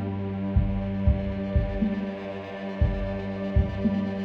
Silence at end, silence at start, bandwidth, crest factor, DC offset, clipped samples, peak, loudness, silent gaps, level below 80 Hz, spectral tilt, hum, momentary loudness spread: 0 s; 0 s; 5.6 kHz; 16 dB; under 0.1%; under 0.1%; -10 dBFS; -28 LUFS; none; -30 dBFS; -10 dB/octave; none; 8 LU